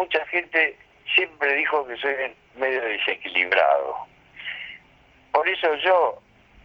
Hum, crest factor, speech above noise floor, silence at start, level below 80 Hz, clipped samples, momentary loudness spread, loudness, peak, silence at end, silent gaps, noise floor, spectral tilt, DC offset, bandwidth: none; 18 dB; 33 dB; 0 s; -64 dBFS; under 0.1%; 16 LU; -22 LUFS; -6 dBFS; 0.45 s; none; -55 dBFS; -4 dB/octave; under 0.1%; 6.6 kHz